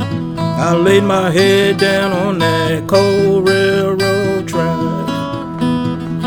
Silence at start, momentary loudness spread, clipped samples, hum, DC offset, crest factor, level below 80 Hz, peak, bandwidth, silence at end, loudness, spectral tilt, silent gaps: 0 s; 8 LU; under 0.1%; none; under 0.1%; 14 dB; -44 dBFS; 0 dBFS; over 20 kHz; 0 s; -14 LUFS; -5.5 dB/octave; none